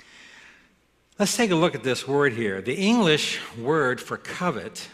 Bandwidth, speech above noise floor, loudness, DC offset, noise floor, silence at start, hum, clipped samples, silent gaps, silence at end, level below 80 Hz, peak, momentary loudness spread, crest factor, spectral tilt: 14.5 kHz; 39 dB; -24 LUFS; under 0.1%; -63 dBFS; 0.25 s; none; under 0.1%; none; 0.05 s; -62 dBFS; -6 dBFS; 8 LU; 18 dB; -4 dB/octave